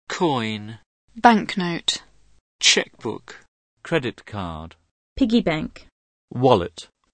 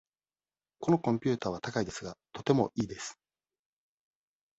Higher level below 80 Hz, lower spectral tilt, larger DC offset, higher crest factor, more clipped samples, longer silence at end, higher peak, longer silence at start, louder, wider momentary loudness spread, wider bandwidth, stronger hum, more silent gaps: first, -50 dBFS vs -64 dBFS; second, -3.5 dB/octave vs -6 dB/octave; neither; about the same, 24 dB vs 22 dB; neither; second, 0.3 s vs 1.45 s; first, 0 dBFS vs -12 dBFS; second, 0.1 s vs 0.8 s; first, -21 LUFS vs -32 LUFS; first, 21 LU vs 14 LU; first, 9.4 kHz vs 8.2 kHz; neither; first, 0.86-1.08 s, 2.41-2.59 s, 3.48-3.77 s, 4.91-5.16 s, 5.92-6.28 s vs none